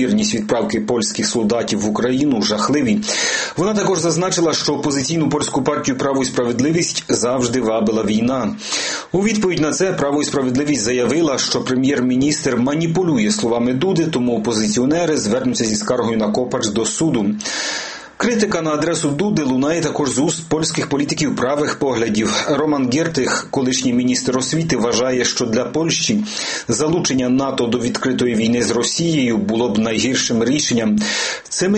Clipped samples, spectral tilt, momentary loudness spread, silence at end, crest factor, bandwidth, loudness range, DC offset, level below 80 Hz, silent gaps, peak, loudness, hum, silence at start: under 0.1%; -4 dB/octave; 3 LU; 0 s; 16 dB; 8.8 kHz; 1 LU; under 0.1%; -50 dBFS; none; -2 dBFS; -17 LUFS; none; 0 s